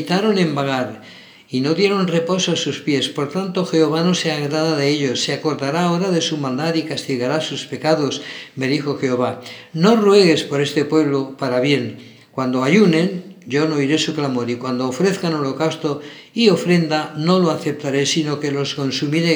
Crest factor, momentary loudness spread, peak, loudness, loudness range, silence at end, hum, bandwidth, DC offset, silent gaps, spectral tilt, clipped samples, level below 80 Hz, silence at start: 18 dB; 8 LU; 0 dBFS; -18 LUFS; 3 LU; 0 s; none; over 20 kHz; under 0.1%; none; -5 dB/octave; under 0.1%; -72 dBFS; 0 s